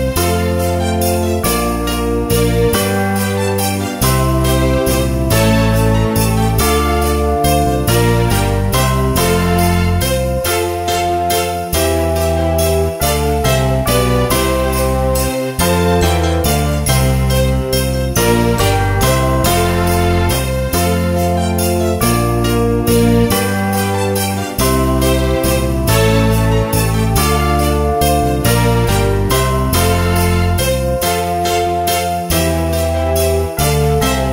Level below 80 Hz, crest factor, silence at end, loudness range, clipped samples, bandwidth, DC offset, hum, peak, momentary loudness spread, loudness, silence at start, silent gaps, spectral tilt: -22 dBFS; 14 dB; 0 s; 1 LU; under 0.1%; 16.5 kHz; under 0.1%; none; 0 dBFS; 3 LU; -14 LUFS; 0 s; none; -5 dB/octave